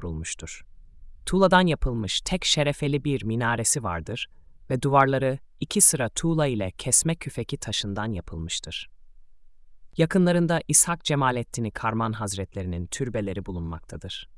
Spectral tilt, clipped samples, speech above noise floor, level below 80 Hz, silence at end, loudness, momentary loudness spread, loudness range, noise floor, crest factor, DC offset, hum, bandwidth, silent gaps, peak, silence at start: -4 dB/octave; under 0.1%; 23 dB; -42 dBFS; 0 s; -24 LUFS; 16 LU; 5 LU; -48 dBFS; 22 dB; under 0.1%; none; 12 kHz; none; -2 dBFS; 0 s